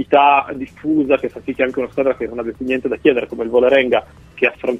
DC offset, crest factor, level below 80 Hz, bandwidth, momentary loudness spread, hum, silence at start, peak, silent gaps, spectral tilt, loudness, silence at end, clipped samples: under 0.1%; 16 dB; -48 dBFS; 8 kHz; 11 LU; none; 0 s; 0 dBFS; none; -6.5 dB/octave; -17 LUFS; 0 s; under 0.1%